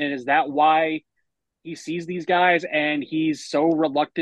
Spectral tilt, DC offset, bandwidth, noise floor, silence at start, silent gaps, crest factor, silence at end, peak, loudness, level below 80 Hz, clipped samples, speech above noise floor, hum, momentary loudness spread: -5 dB/octave; under 0.1%; 9.8 kHz; -77 dBFS; 0 s; none; 16 dB; 0 s; -6 dBFS; -21 LUFS; -74 dBFS; under 0.1%; 55 dB; none; 12 LU